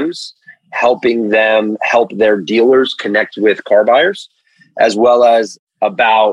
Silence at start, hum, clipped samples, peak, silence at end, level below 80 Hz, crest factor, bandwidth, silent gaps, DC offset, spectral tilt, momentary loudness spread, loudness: 0 s; none; under 0.1%; 0 dBFS; 0 s; -60 dBFS; 12 dB; 10.5 kHz; 5.59-5.67 s; under 0.1%; -4.5 dB/octave; 12 LU; -12 LUFS